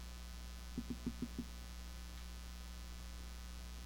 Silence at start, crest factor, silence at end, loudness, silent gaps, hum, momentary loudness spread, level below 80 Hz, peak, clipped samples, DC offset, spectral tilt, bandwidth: 0 s; 20 dB; 0 s; -50 LUFS; none; none; 6 LU; -50 dBFS; -28 dBFS; under 0.1%; under 0.1%; -4.5 dB/octave; 18.5 kHz